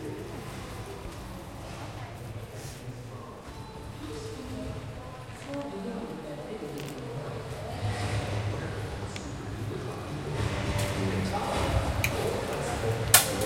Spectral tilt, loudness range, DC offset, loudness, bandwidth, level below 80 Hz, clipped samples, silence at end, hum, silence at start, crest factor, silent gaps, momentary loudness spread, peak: -4 dB/octave; 10 LU; under 0.1%; -32 LUFS; 16.5 kHz; -44 dBFS; under 0.1%; 0 s; none; 0 s; 32 dB; none; 13 LU; -2 dBFS